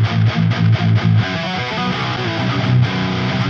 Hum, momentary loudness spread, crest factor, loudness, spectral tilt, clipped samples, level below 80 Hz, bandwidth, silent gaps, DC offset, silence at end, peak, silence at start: none; 5 LU; 14 dB; -17 LUFS; -7 dB/octave; under 0.1%; -44 dBFS; 6.8 kHz; none; under 0.1%; 0 s; -2 dBFS; 0 s